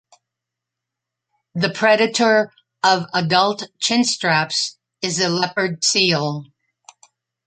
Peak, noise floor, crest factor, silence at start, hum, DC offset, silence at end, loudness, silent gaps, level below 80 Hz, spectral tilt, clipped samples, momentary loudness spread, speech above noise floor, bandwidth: 0 dBFS; -84 dBFS; 20 dB; 1.55 s; none; under 0.1%; 1 s; -18 LUFS; none; -66 dBFS; -3 dB/octave; under 0.1%; 11 LU; 65 dB; 9.4 kHz